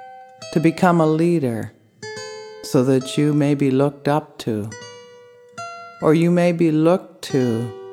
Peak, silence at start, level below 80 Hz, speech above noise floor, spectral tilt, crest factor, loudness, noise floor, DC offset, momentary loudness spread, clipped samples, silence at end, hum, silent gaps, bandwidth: -2 dBFS; 0 s; -64 dBFS; 28 dB; -7 dB/octave; 18 dB; -19 LUFS; -46 dBFS; under 0.1%; 18 LU; under 0.1%; 0 s; none; none; 15.5 kHz